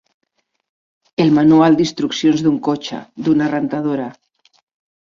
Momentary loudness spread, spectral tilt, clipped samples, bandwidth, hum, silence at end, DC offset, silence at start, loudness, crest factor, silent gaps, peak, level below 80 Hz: 13 LU; -6.5 dB/octave; under 0.1%; 7.4 kHz; none; 0.9 s; under 0.1%; 1.2 s; -16 LUFS; 14 dB; none; -2 dBFS; -56 dBFS